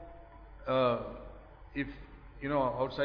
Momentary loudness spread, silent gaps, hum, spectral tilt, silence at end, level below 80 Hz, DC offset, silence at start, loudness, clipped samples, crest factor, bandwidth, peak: 24 LU; none; none; -4.5 dB/octave; 0 s; -52 dBFS; under 0.1%; 0 s; -34 LUFS; under 0.1%; 18 dB; 5.4 kHz; -18 dBFS